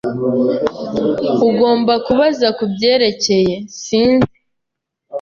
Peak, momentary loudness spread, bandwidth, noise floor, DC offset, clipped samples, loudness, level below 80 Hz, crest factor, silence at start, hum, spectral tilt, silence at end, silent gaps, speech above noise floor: -2 dBFS; 7 LU; 7.4 kHz; -78 dBFS; under 0.1%; under 0.1%; -15 LUFS; -48 dBFS; 14 dB; 0.05 s; none; -5 dB/octave; 0 s; none; 64 dB